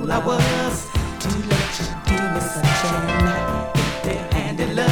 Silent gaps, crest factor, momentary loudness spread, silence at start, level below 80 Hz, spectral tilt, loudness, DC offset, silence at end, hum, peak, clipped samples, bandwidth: none; 16 dB; 5 LU; 0 s; -30 dBFS; -5 dB/octave; -21 LUFS; under 0.1%; 0 s; none; -4 dBFS; under 0.1%; over 20 kHz